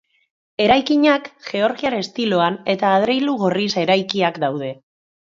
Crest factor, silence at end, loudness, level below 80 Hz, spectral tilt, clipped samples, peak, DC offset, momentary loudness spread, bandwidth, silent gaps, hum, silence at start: 18 dB; 0.45 s; -18 LUFS; -56 dBFS; -5.5 dB/octave; under 0.1%; -2 dBFS; under 0.1%; 8 LU; 7.6 kHz; none; none; 0.6 s